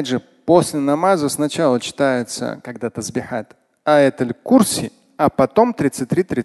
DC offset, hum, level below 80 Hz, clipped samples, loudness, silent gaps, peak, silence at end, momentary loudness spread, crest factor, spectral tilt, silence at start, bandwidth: under 0.1%; none; -52 dBFS; under 0.1%; -18 LUFS; none; 0 dBFS; 0 s; 11 LU; 18 dB; -5 dB/octave; 0 s; 12.5 kHz